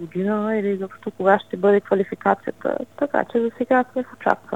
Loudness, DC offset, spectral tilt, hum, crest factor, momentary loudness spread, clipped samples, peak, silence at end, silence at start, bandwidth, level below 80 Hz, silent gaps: -22 LUFS; 0.2%; -8 dB/octave; none; 22 dB; 8 LU; under 0.1%; 0 dBFS; 0 s; 0 s; 8.4 kHz; -66 dBFS; none